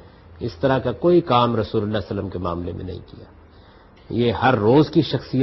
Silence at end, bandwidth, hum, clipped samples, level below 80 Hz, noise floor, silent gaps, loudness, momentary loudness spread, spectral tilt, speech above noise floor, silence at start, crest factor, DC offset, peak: 0 s; 6 kHz; none; under 0.1%; -46 dBFS; -48 dBFS; none; -20 LUFS; 16 LU; -9 dB/octave; 28 dB; 0.3 s; 18 dB; under 0.1%; -4 dBFS